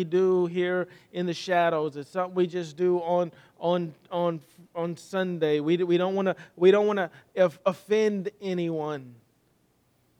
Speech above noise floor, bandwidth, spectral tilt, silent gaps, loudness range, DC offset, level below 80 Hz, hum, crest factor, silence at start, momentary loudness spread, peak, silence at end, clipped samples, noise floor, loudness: 41 dB; 10 kHz; -6.5 dB/octave; none; 4 LU; under 0.1%; -78 dBFS; none; 18 dB; 0 s; 10 LU; -8 dBFS; 1.05 s; under 0.1%; -67 dBFS; -27 LUFS